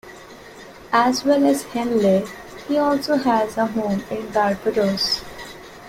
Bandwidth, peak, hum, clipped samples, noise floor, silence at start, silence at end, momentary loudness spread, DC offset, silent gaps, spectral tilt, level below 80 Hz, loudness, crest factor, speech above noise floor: 16.5 kHz; -4 dBFS; none; under 0.1%; -41 dBFS; 0.05 s; 0 s; 21 LU; under 0.1%; none; -5 dB/octave; -52 dBFS; -20 LUFS; 18 dB; 22 dB